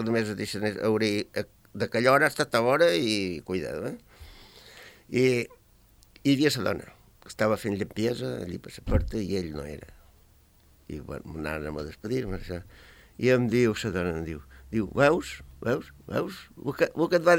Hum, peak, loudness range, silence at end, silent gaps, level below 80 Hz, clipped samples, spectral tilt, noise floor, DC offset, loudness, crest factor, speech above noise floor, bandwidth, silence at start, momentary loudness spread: none; -8 dBFS; 9 LU; 0 s; none; -46 dBFS; under 0.1%; -5.5 dB/octave; -59 dBFS; under 0.1%; -27 LUFS; 20 dB; 32 dB; 17 kHz; 0 s; 16 LU